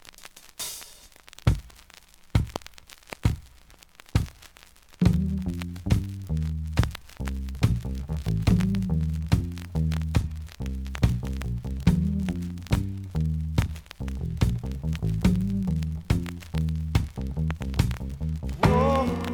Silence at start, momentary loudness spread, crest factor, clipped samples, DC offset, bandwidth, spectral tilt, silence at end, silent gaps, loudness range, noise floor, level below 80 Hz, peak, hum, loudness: 0.2 s; 11 LU; 20 dB; under 0.1%; under 0.1%; 20 kHz; -7 dB/octave; 0 s; none; 5 LU; -52 dBFS; -34 dBFS; -6 dBFS; none; -28 LUFS